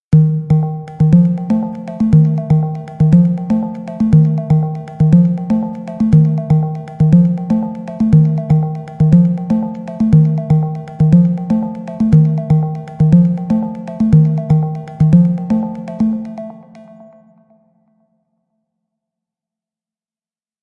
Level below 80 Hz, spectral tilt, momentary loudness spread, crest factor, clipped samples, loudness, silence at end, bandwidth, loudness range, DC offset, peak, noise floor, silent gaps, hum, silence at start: -38 dBFS; -11 dB/octave; 11 LU; 14 dB; under 0.1%; -14 LUFS; 3.8 s; 2.7 kHz; 3 LU; under 0.1%; 0 dBFS; under -90 dBFS; none; none; 0.1 s